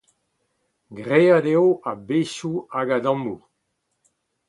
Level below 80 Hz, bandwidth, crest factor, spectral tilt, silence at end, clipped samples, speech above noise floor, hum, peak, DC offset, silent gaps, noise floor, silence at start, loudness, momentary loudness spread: -68 dBFS; 11 kHz; 20 dB; -6.5 dB/octave; 1.1 s; under 0.1%; 54 dB; none; -4 dBFS; under 0.1%; none; -75 dBFS; 0.9 s; -21 LUFS; 14 LU